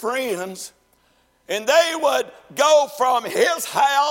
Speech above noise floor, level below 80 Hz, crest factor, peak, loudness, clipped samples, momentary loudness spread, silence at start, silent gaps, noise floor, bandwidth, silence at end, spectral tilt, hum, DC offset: 42 dB; -68 dBFS; 16 dB; -4 dBFS; -19 LUFS; under 0.1%; 14 LU; 0 s; none; -61 dBFS; 16.5 kHz; 0 s; -1.5 dB/octave; none; under 0.1%